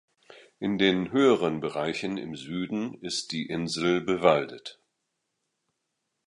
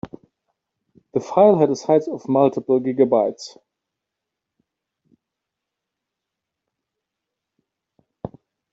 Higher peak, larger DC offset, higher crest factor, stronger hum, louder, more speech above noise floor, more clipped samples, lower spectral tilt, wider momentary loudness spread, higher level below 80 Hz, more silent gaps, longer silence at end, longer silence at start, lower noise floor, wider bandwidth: second, -6 dBFS vs -2 dBFS; neither; about the same, 22 dB vs 20 dB; neither; second, -27 LUFS vs -18 LUFS; second, 54 dB vs 65 dB; neither; second, -5 dB/octave vs -7.5 dB/octave; second, 12 LU vs 22 LU; about the same, -64 dBFS vs -64 dBFS; neither; first, 1.55 s vs 0.45 s; first, 0.3 s vs 0.05 s; about the same, -81 dBFS vs -83 dBFS; first, 11.5 kHz vs 7.8 kHz